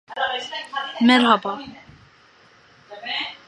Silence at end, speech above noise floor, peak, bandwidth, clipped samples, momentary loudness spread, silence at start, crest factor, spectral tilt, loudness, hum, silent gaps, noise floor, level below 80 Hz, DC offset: 0.1 s; 32 dB; 0 dBFS; 11 kHz; under 0.1%; 18 LU; 0.1 s; 22 dB; -4 dB/octave; -20 LUFS; none; none; -53 dBFS; -66 dBFS; under 0.1%